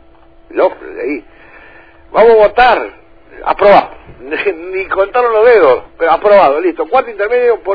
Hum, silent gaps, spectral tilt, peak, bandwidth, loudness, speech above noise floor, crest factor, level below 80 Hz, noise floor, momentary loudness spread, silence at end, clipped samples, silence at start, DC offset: none; none; -7 dB/octave; 0 dBFS; 5.4 kHz; -10 LUFS; 33 dB; 12 dB; -40 dBFS; -43 dBFS; 15 LU; 0 s; 0.2%; 0.5 s; 0.5%